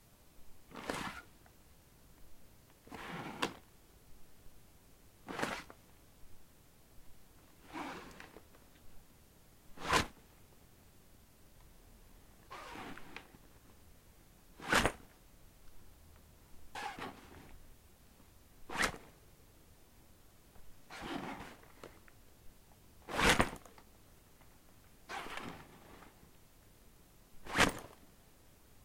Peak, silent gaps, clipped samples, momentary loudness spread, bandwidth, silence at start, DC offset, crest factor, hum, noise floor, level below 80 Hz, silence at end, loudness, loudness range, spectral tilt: -10 dBFS; none; under 0.1%; 30 LU; 16.5 kHz; 0.1 s; under 0.1%; 34 dB; none; -62 dBFS; -58 dBFS; 0 s; -38 LUFS; 15 LU; -3 dB/octave